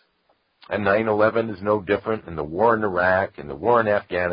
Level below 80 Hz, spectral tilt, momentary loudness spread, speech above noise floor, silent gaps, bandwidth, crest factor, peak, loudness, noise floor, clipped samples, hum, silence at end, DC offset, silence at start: -50 dBFS; -11 dB/octave; 9 LU; 45 dB; none; 5.2 kHz; 18 dB; -4 dBFS; -22 LUFS; -66 dBFS; under 0.1%; none; 0 s; under 0.1%; 0.7 s